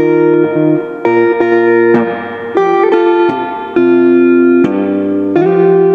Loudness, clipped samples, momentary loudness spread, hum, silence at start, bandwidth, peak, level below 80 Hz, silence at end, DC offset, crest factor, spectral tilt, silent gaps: -10 LUFS; under 0.1%; 6 LU; none; 0 s; 4.7 kHz; 0 dBFS; -58 dBFS; 0 s; under 0.1%; 10 dB; -9 dB/octave; none